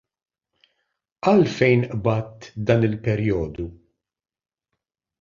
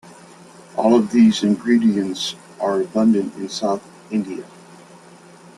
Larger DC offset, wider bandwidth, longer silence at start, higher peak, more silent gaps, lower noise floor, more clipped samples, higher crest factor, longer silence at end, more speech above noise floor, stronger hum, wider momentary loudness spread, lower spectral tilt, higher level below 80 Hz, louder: neither; second, 7.4 kHz vs 11.5 kHz; first, 1.25 s vs 0.05 s; about the same, -4 dBFS vs -2 dBFS; neither; first, -81 dBFS vs -45 dBFS; neither; about the same, 20 dB vs 18 dB; first, 1.45 s vs 1.1 s; first, 61 dB vs 27 dB; neither; about the same, 14 LU vs 12 LU; first, -8 dB/octave vs -5.5 dB/octave; first, -48 dBFS vs -62 dBFS; about the same, -21 LUFS vs -19 LUFS